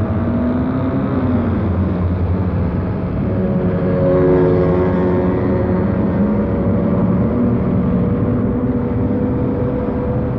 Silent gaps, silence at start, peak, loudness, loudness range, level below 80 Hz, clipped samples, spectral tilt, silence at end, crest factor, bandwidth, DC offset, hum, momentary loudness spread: none; 0 s; -4 dBFS; -17 LUFS; 3 LU; -28 dBFS; under 0.1%; -12 dB/octave; 0 s; 12 dB; 5 kHz; under 0.1%; none; 5 LU